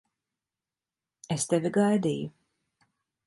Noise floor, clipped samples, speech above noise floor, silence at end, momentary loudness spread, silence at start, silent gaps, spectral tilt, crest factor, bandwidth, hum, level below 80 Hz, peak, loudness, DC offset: under -90 dBFS; under 0.1%; over 64 dB; 0.95 s; 11 LU; 1.3 s; none; -5.5 dB/octave; 20 dB; 11.5 kHz; none; -70 dBFS; -12 dBFS; -27 LUFS; under 0.1%